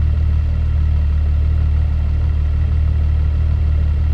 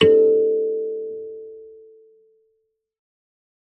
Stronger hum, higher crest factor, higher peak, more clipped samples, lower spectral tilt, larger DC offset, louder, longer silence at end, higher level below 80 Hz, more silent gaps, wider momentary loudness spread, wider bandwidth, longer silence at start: neither; second, 8 dB vs 20 dB; second, -6 dBFS vs -2 dBFS; neither; first, -9.5 dB/octave vs -6 dB/octave; neither; about the same, -18 LUFS vs -19 LUFS; second, 0 s vs 1.9 s; first, -18 dBFS vs -68 dBFS; neither; second, 1 LU vs 24 LU; about the same, 4.5 kHz vs 4.6 kHz; about the same, 0 s vs 0 s